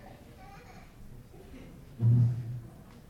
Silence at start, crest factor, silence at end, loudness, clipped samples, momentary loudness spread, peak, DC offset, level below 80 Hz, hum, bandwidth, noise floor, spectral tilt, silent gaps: 0.05 s; 16 dB; 0.4 s; -29 LUFS; under 0.1%; 26 LU; -16 dBFS; under 0.1%; -54 dBFS; none; 5 kHz; -50 dBFS; -9 dB/octave; none